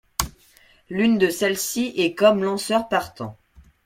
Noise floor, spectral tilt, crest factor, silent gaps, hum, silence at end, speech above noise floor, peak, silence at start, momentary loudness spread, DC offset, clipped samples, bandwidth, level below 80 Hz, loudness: -55 dBFS; -4 dB/octave; 22 dB; none; none; 0.55 s; 34 dB; 0 dBFS; 0.2 s; 15 LU; under 0.1%; under 0.1%; 16.5 kHz; -48 dBFS; -21 LUFS